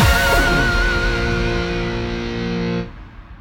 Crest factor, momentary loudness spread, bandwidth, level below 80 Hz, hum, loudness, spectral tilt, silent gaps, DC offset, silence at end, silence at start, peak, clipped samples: 14 dB; 9 LU; 17.5 kHz; -24 dBFS; none; -19 LUFS; -5 dB/octave; none; under 0.1%; 0 s; 0 s; -4 dBFS; under 0.1%